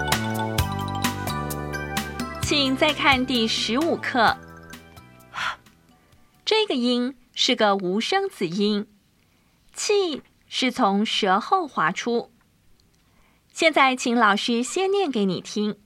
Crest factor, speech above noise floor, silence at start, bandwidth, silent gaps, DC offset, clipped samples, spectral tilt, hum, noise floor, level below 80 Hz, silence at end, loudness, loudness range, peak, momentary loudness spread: 20 dB; 40 dB; 0 s; 16 kHz; none; under 0.1%; under 0.1%; -4 dB/octave; none; -61 dBFS; -46 dBFS; 0.1 s; -23 LUFS; 3 LU; -4 dBFS; 11 LU